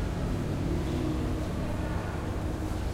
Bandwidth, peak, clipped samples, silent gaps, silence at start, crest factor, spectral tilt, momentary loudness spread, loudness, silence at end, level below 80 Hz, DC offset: 16 kHz; -18 dBFS; under 0.1%; none; 0 s; 12 dB; -7 dB/octave; 3 LU; -32 LUFS; 0 s; -36 dBFS; under 0.1%